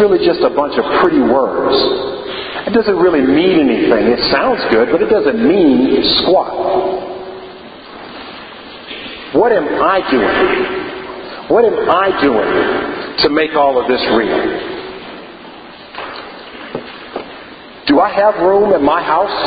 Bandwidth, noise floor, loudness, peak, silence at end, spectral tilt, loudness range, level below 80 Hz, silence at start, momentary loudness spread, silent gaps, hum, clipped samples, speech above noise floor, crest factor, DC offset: 5 kHz; -34 dBFS; -13 LUFS; 0 dBFS; 0 s; -8 dB/octave; 8 LU; -44 dBFS; 0 s; 19 LU; none; none; under 0.1%; 22 dB; 14 dB; under 0.1%